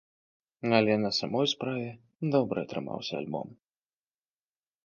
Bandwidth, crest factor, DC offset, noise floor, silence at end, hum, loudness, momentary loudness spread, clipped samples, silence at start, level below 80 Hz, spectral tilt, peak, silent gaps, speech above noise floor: 7.2 kHz; 24 dB; under 0.1%; under -90 dBFS; 1.3 s; none; -30 LUFS; 12 LU; under 0.1%; 0.65 s; -70 dBFS; -5.5 dB/octave; -8 dBFS; none; over 61 dB